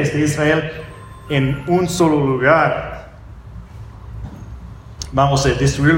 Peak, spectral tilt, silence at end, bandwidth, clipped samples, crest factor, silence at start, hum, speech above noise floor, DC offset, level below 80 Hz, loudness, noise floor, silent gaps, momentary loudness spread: 0 dBFS; -5.5 dB/octave; 0 s; 16.5 kHz; under 0.1%; 16 dB; 0 s; none; 21 dB; under 0.1%; -36 dBFS; -16 LUFS; -36 dBFS; none; 22 LU